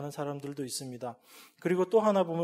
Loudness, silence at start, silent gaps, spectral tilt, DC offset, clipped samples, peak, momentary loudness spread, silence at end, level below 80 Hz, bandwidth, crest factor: -31 LUFS; 0 s; none; -5.5 dB/octave; under 0.1%; under 0.1%; -14 dBFS; 16 LU; 0 s; -80 dBFS; 16 kHz; 18 dB